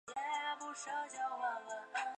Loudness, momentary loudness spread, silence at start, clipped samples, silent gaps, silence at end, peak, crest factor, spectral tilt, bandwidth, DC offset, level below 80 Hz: -41 LUFS; 4 LU; 0.05 s; under 0.1%; none; 0 s; -26 dBFS; 14 dB; 0 dB/octave; 10.5 kHz; under 0.1%; under -90 dBFS